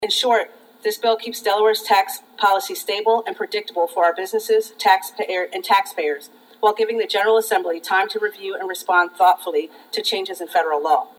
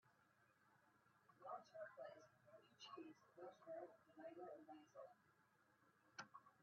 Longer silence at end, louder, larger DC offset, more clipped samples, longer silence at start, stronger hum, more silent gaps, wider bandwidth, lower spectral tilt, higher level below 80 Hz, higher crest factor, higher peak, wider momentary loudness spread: about the same, 0.1 s vs 0 s; first, -20 LUFS vs -61 LUFS; neither; neither; about the same, 0 s vs 0.05 s; neither; neither; first, 18.5 kHz vs 6.6 kHz; second, -1 dB/octave vs -2.5 dB/octave; first, -84 dBFS vs under -90 dBFS; about the same, 18 dB vs 20 dB; first, 0 dBFS vs -42 dBFS; about the same, 8 LU vs 6 LU